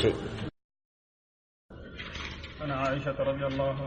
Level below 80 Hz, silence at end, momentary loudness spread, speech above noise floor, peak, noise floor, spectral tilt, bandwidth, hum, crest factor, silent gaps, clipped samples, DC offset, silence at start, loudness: -48 dBFS; 0 s; 14 LU; over 60 dB; -12 dBFS; under -90 dBFS; -6.5 dB/octave; 9 kHz; none; 20 dB; 0.64-0.69 s, 0.85-1.69 s; under 0.1%; under 0.1%; 0 s; -33 LUFS